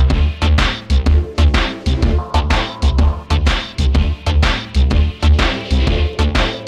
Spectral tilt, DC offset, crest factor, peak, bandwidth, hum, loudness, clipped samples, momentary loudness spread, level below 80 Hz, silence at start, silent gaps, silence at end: -6 dB/octave; under 0.1%; 14 dB; 0 dBFS; 9.4 kHz; none; -16 LUFS; under 0.1%; 3 LU; -16 dBFS; 0 s; none; 0 s